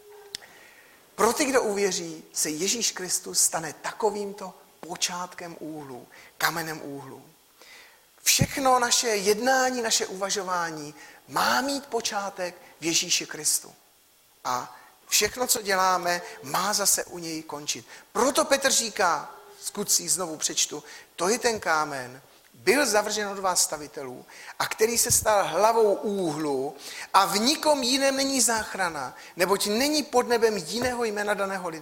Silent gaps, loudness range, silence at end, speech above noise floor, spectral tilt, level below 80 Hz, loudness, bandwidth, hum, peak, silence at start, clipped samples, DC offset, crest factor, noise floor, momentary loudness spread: none; 5 LU; 0 s; 34 dB; -2 dB/octave; -60 dBFS; -25 LUFS; 16.5 kHz; none; -6 dBFS; 0.05 s; under 0.1%; under 0.1%; 22 dB; -60 dBFS; 16 LU